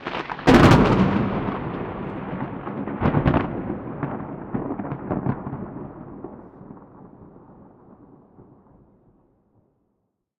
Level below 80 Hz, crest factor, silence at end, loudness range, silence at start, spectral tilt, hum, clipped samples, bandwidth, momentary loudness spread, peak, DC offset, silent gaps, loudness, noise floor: -40 dBFS; 20 dB; 1.95 s; 21 LU; 0 s; -7.5 dB/octave; none; under 0.1%; 15 kHz; 24 LU; -4 dBFS; under 0.1%; none; -22 LUFS; -74 dBFS